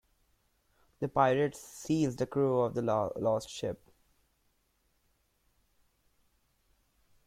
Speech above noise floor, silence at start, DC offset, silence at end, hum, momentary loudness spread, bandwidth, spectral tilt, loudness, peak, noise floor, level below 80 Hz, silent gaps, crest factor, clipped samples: 44 dB; 1 s; under 0.1%; 3.5 s; none; 12 LU; 16 kHz; -6.5 dB/octave; -31 LUFS; -12 dBFS; -75 dBFS; -66 dBFS; none; 22 dB; under 0.1%